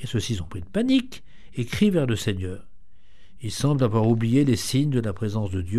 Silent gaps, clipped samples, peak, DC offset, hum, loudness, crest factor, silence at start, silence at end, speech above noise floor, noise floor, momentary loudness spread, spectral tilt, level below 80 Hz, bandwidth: none; under 0.1%; -8 dBFS; 1%; none; -24 LUFS; 16 dB; 0 s; 0 s; 31 dB; -54 dBFS; 14 LU; -6 dB/octave; -48 dBFS; 14.5 kHz